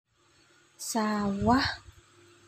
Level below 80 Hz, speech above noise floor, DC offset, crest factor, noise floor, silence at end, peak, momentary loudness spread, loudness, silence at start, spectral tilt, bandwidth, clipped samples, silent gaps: -52 dBFS; 37 dB; under 0.1%; 22 dB; -64 dBFS; 0.65 s; -10 dBFS; 13 LU; -28 LUFS; 0.8 s; -4.5 dB/octave; 16 kHz; under 0.1%; none